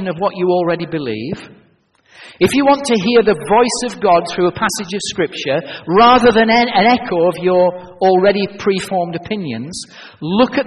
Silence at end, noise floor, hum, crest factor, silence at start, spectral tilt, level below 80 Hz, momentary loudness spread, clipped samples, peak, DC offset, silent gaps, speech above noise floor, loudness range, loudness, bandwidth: 0 s; -54 dBFS; none; 14 dB; 0 s; -4.5 dB/octave; -48 dBFS; 12 LU; under 0.1%; 0 dBFS; under 0.1%; none; 39 dB; 4 LU; -14 LUFS; 11.5 kHz